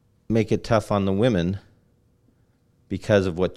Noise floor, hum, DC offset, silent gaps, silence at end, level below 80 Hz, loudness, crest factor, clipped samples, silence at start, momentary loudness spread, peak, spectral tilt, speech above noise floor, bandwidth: -62 dBFS; none; under 0.1%; none; 0 s; -48 dBFS; -23 LUFS; 20 dB; under 0.1%; 0.3 s; 12 LU; -6 dBFS; -7 dB/octave; 41 dB; 12.5 kHz